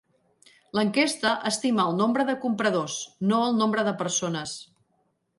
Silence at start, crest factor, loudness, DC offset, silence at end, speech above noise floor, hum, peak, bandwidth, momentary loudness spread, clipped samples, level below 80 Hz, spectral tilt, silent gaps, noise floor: 0.75 s; 16 dB; -25 LUFS; under 0.1%; 0.75 s; 47 dB; none; -10 dBFS; 11.5 kHz; 8 LU; under 0.1%; -70 dBFS; -4 dB/octave; none; -71 dBFS